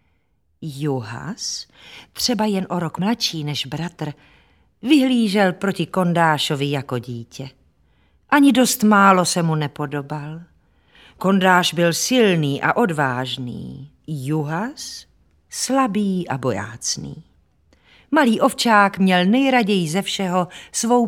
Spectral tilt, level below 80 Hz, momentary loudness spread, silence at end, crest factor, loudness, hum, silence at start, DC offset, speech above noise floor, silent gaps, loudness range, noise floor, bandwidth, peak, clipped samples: -4.5 dB/octave; -58 dBFS; 17 LU; 0 s; 20 dB; -19 LUFS; none; 0.6 s; under 0.1%; 47 dB; none; 6 LU; -66 dBFS; 17 kHz; 0 dBFS; under 0.1%